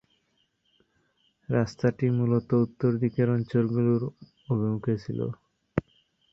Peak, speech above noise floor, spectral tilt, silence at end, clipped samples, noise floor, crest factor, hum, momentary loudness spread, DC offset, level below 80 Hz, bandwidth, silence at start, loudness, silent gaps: -8 dBFS; 47 dB; -9.5 dB/octave; 0.55 s; under 0.1%; -72 dBFS; 20 dB; none; 9 LU; under 0.1%; -58 dBFS; 7.2 kHz; 1.5 s; -27 LUFS; none